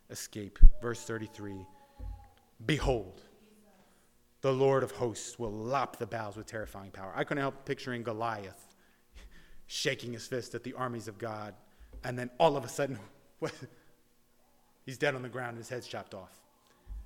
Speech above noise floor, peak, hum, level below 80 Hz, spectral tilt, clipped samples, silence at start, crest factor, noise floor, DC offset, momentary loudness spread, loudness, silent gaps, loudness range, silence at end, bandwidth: 36 dB; -4 dBFS; none; -34 dBFS; -5 dB/octave; under 0.1%; 0.1 s; 28 dB; -66 dBFS; under 0.1%; 20 LU; -35 LUFS; none; 5 LU; 0 s; 12 kHz